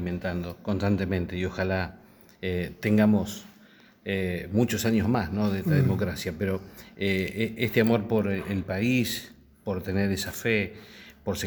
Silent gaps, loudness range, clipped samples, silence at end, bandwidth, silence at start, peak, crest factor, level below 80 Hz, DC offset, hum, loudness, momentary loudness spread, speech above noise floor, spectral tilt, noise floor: none; 2 LU; under 0.1%; 0 s; over 20 kHz; 0 s; -8 dBFS; 20 dB; -52 dBFS; under 0.1%; none; -27 LUFS; 12 LU; 29 dB; -6 dB/octave; -55 dBFS